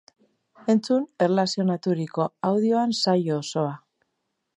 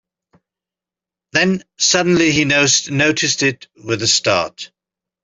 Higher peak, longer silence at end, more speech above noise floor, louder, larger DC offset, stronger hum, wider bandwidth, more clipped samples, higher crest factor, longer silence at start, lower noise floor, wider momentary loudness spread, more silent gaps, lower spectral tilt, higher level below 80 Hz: second, -8 dBFS vs -2 dBFS; first, 0.8 s vs 0.6 s; second, 55 dB vs 72 dB; second, -24 LUFS vs -15 LUFS; neither; neither; first, 11 kHz vs 8.4 kHz; neither; about the same, 16 dB vs 16 dB; second, 0.65 s vs 1.35 s; second, -78 dBFS vs -88 dBFS; second, 6 LU vs 12 LU; neither; first, -6 dB/octave vs -2.5 dB/octave; second, -76 dBFS vs -54 dBFS